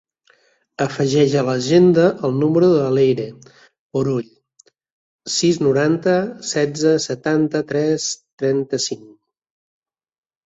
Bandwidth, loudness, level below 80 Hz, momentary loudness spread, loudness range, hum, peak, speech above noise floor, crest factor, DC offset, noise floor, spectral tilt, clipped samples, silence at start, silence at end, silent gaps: 8 kHz; -18 LUFS; -60 dBFS; 10 LU; 4 LU; none; -2 dBFS; 41 dB; 16 dB; under 0.1%; -59 dBFS; -5.5 dB/octave; under 0.1%; 0.8 s; 1.4 s; 3.79-3.90 s, 4.92-5.19 s, 8.33-8.38 s